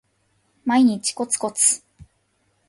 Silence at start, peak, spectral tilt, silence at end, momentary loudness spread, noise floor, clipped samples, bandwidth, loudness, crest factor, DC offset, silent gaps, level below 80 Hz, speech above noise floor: 0.65 s; -4 dBFS; -2.5 dB/octave; 0.65 s; 9 LU; -67 dBFS; under 0.1%; 12 kHz; -20 LUFS; 18 dB; under 0.1%; none; -62 dBFS; 47 dB